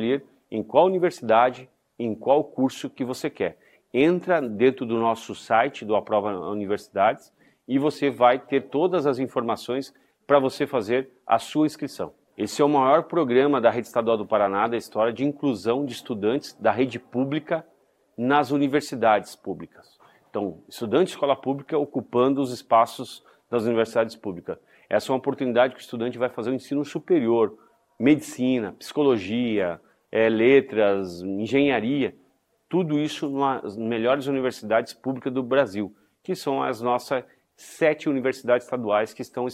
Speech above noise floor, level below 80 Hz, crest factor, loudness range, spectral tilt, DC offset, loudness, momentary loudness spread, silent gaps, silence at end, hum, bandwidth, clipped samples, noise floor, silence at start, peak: 41 dB; -66 dBFS; 20 dB; 4 LU; -6 dB/octave; under 0.1%; -24 LUFS; 11 LU; none; 0 s; none; 15 kHz; under 0.1%; -65 dBFS; 0 s; -4 dBFS